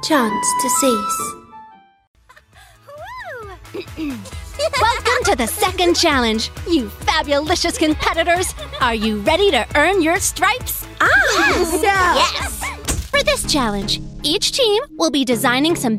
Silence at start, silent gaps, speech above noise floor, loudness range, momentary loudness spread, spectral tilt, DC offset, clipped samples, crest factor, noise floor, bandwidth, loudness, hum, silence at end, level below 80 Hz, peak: 0 s; 2.07-2.14 s; 30 dB; 8 LU; 13 LU; -3 dB/octave; under 0.1%; under 0.1%; 16 dB; -47 dBFS; 16 kHz; -17 LUFS; none; 0 s; -34 dBFS; -2 dBFS